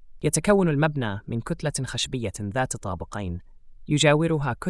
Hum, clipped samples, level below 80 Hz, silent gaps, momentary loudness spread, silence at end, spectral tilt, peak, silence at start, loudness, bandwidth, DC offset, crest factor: none; under 0.1%; -46 dBFS; none; 13 LU; 0 s; -5 dB/octave; -6 dBFS; 0 s; -25 LUFS; 12 kHz; under 0.1%; 20 dB